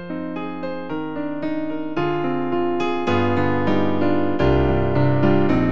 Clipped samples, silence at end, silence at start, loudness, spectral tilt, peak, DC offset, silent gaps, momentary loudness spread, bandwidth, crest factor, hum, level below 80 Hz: under 0.1%; 0 s; 0 s; -21 LUFS; -8.5 dB/octave; -6 dBFS; 4%; none; 10 LU; 7.2 kHz; 14 dB; none; -36 dBFS